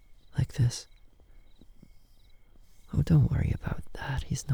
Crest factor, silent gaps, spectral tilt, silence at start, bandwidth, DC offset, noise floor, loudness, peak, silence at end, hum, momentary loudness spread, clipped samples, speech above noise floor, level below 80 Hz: 18 dB; none; -6.5 dB/octave; 0.1 s; 19.5 kHz; under 0.1%; -54 dBFS; -30 LUFS; -12 dBFS; 0 s; none; 13 LU; under 0.1%; 27 dB; -42 dBFS